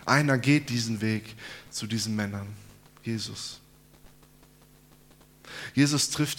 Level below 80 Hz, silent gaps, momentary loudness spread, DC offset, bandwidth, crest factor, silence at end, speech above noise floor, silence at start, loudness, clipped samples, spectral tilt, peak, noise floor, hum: -62 dBFS; none; 19 LU; under 0.1%; 17.5 kHz; 24 dB; 0 s; 29 dB; 0 s; -28 LUFS; under 0.1%; -4.5 dB/octave; -4 dBFS; -56 dBFS; none